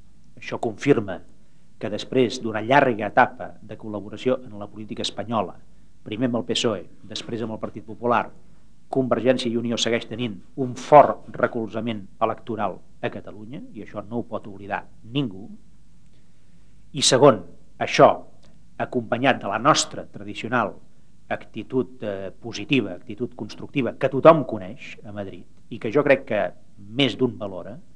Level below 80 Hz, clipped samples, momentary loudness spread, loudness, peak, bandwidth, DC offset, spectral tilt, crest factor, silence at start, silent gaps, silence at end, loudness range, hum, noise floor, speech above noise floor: -58 dBFS; under 0.1%; 19 LU; -23 LUFS; 0 dBFS; 10.5 kHz; 1%; -4.5 dB/octave; 24 dB; 0.4 s; none; 0.15 s; 9 LU; none; -56 dBFS; 33 dB